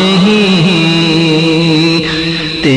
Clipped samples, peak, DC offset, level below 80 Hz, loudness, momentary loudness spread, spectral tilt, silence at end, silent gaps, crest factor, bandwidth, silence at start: under 0.1%; 0 dBFS; under 0.1%; -38 dBFS; -9 LUFS; 5 LU; -5.5 dB/octave; 0 s; none; 10 dB; 10.5 kHz; 0 s